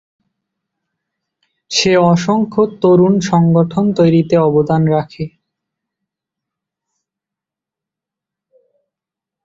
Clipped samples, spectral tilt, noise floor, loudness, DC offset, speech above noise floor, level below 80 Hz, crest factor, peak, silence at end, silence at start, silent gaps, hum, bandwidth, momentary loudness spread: under 0.1%; -6.5 dB/octave; -85 dBFS; -13 LUFS; under 0.1%; 73 dB; -54 dBFS; 16 dB; 0 dBFS; 4.15 s; 1.7 s; none; none; 7.8 kHz; 7 LU